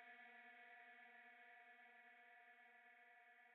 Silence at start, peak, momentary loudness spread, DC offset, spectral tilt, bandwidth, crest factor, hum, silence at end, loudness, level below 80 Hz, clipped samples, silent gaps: 0 s; -52 dBFS; 5 LU; under 0.1%; 2 dB/octave; 4 kHz; 14 dB; none; 0 s; -65 LUFS; under -90 dBFS; under 0.1%; none